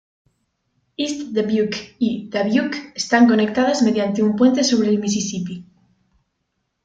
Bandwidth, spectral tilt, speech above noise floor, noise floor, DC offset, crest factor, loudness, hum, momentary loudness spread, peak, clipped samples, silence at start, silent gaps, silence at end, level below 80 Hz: 9 kHz; -4.5 dB/octave; 55 dB; -73 dBFS; under 0.1%; 18 dB; -19 LUFS; none; 11 LU; -2 dBFS; under 0.1%; 1 s; none; 1.2 s; -60 dBFS